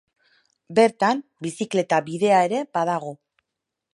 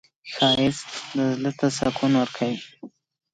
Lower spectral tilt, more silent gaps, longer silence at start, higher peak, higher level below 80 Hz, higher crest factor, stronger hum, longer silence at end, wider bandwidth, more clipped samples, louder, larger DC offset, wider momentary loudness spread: about the same, -5 dB/octave vs -5 dB/octave; neither; first, 0.7 s vs 0.25 s; first, -4 dBFS vs -8 dBFS; second, -74 dBFS vs -56 dBFS; about the same, 20 dB vs 18 dB; neither; first, 0.8 s vs 0.45 s; first, 11.5 kHz vs 9.4 kHz; neither; about the same, -22 LUFS vs -23 LUFS; neither; about the same, 11 LU vs 13 LU